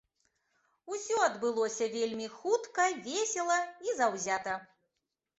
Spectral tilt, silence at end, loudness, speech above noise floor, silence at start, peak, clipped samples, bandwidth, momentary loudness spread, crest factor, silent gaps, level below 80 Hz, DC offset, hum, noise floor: -2 dB/octave; 0.75 s; -32 LUFS; 54 dB; 0.85 s; -14 dBFS; under 0.1%; 8.2 kHz; 8 LU; 18 dB; none; -78 dBFS; under 0.1%; none; -86 dBFS